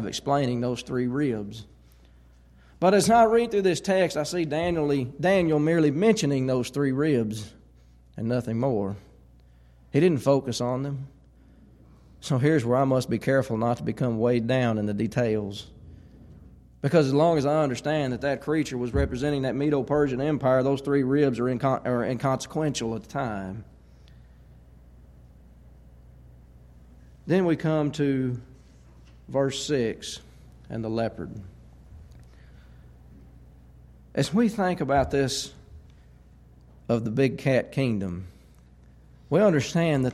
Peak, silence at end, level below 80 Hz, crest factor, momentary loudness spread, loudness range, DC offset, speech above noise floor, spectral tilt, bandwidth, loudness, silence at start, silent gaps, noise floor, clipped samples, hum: -8 dBFS; 0 s; -48 dBFS; 18 dB; 13 LU; 8 LU; under 0.1%; 30 dB; -6 dB/octave; 14 kHz; -25 LUFS; 0 s; none; -54 dBFS; under 0.1%; none